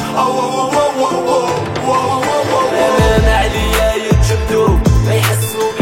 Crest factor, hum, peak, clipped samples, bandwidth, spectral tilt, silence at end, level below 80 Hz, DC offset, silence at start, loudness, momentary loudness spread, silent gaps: 12 dB; none; 0 dBFS; under 0.1%; 16.5 kHz; -5 dB/octave; 0 s; -20 dBFS; under 0.1%; 0 s; -13 LUFS; 4 LU; none